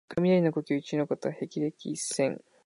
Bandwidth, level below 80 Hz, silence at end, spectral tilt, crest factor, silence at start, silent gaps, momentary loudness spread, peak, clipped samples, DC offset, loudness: 11.5 kHz; -70 dBFS; 0.3 s; -5.5 dB/octave; 16 dB; 0.1 s; none; 9 LU; -14 dBFS; under 0.1%; under 0.1%; -29 LUFS